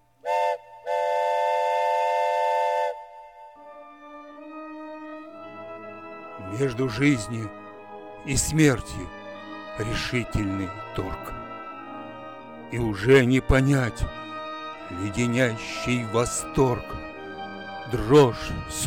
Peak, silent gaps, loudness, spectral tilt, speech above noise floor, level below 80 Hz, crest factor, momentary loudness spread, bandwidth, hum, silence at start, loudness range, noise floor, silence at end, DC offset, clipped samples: -8 dBFS; none; -25 LUFS; -5.5 dB/octave; 22 dB; -42 dBFS; 18 dB; 20 LU; 17 kHz; none; 0.25 s; 8 LU; -46 dBFS; 0 s; 0.1%; under 0.1%